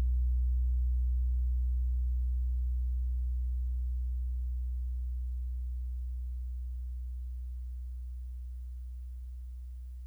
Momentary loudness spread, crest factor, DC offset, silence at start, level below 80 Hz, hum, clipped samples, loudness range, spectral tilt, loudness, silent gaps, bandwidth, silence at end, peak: 12 LU; 8 dB; under 0.1%; 0 s; -32 dBFS; none; under 0.1%; 9 LU; -8.5 dB/octave; -36 LUFS; none; 0.3 kHz; 0 s; -26 dBFS